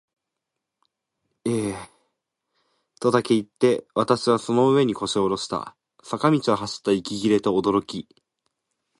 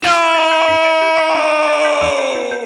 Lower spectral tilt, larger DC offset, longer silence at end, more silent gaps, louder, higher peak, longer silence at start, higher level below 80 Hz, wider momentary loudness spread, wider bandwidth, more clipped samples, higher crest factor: first, -5.5 dB/octave vs -2 dB/octave; neither; first, 0.95 s vs 0 s; neither; second, -23 LUFS vs -13 LUFS; second, -4 dBFS vs 0 dBFS; first, 1.45 s vs 0 s; second, -60 dBFS vs -52 dBFS; first, 12 LU vs 4 LU; about the same, 11.5 kHz vs 11.5 kHz; neither; first, 20 dB vs 14 dB